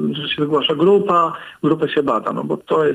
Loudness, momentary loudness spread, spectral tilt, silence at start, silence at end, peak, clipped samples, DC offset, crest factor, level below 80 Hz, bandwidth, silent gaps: -18 LUFS; 8 LU; -7 dB/octave; 0 s; 0 s; -2 dBFS; under 0.1%; under 0.1%; 14 dB; -60 dBFS; 10.5 kHz; none